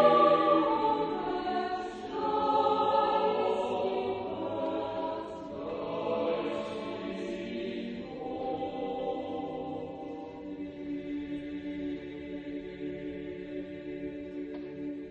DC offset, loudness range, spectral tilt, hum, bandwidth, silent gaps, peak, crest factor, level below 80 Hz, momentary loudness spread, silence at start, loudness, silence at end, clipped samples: under 0.1%; 10 LU; -6.5 dB/octave; none; 8.8 kHz; none; -10 dBFS; 22 dB; -62 dBFS; 13 LU; 0 s; -33 LUFS; 0 s; under 0.1%